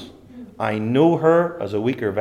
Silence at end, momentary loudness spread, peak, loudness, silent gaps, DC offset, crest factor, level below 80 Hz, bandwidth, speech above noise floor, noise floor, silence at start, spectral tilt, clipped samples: 0 s; 9 LU; -4 dBFS; -19 LUFS; none; under 0.1%; 16 dB; -60 dBFS; 11 kHz; 22 dB; -41 dBFS; 0 s; -8 dB/octave; under 0.1%